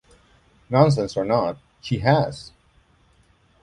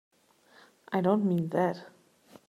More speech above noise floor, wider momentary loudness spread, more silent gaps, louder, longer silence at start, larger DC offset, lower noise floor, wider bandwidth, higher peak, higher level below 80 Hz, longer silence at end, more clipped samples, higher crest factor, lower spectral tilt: first, 39 dB vs 34 dB; first, 12 LU vs 8 LU; neither; first, -21 LUFS vs -29 LUFS; second, 0.7 s vs 0.9 s; neither; about the same, -59 dBFS vs -62 dBFS; second, 10.5 kHz vs 13.5 kHz; first, -2 dBFS vs -12 dBFS; first, -50 dBFS vs -76 dBFS; first, 1.15 s vs 0.6 s; neither; about the same, 22 dB vs 20 dB; second, -7 dB/octave vs -8.5 dB/octave